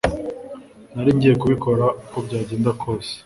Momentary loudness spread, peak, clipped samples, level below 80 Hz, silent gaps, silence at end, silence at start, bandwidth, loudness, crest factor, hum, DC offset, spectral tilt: 19 LU; -2 dBFS; under 0.1%; -42 dBFS; none; 0.05 s; 0.05 s; 11.5 kHz; -20 LUFS; 18 dB; none; under 0.1%; -7.5 dB/octave